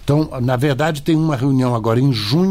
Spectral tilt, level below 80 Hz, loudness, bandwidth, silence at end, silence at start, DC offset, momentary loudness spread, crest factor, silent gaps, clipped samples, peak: -7 dB/octave; -42 dBFS; -17 LUFS; 16 kHz; 0 s; 0 s; under 0.1%; 2 LU; 10 dB; none; under 0.1%; -6 dBFS